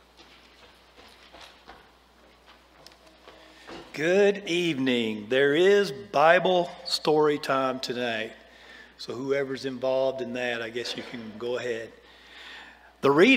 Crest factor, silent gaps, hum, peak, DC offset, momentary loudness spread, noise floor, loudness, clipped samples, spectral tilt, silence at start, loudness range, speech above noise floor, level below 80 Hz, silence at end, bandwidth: 22 dB; none; none; -4 dBFS; under 0.1%; 23 LU; -57 dBFS; -25 LUFS; under 0.1%; -4.5 dB/octave; 1.35 s; 8 LU; 32 dB; -66 dBFS; 0 s; 15.5 kHz